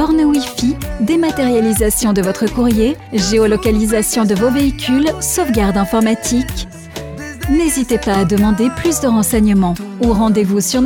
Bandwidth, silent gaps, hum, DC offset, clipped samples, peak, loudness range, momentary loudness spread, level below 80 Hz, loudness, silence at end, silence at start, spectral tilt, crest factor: 19 kHz; none; none; under 0.1%; under 0.1%; -2 dBFS; 2 LU; 5 LU; -28 dBFS; -14 LUFS; 0 s; 0 s; -5 dB/octave; 12 dB